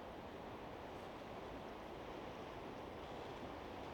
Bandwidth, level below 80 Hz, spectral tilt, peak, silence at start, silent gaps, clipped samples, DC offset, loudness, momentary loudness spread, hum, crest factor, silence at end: 18 kHz; -64 dBFS; -5.5 dB/octave; -38 dBFS; 0 s; none; under 0.1%; under 0.1%; -51 LUFS; 1 LU; none; 14 dB; 0 s